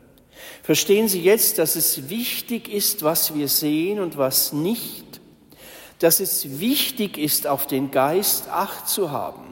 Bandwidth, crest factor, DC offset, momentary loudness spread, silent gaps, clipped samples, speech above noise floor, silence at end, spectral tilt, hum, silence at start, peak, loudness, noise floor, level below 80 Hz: 16.5 kHz; 18 dB; under 0.1%; 9 LU; none; under 0.1%; 26 dB; 0 s; -3 dB/octave; none; 0.35 s; -4 dBFS; -20 LUFS; -48 dBFS; -62 dBFS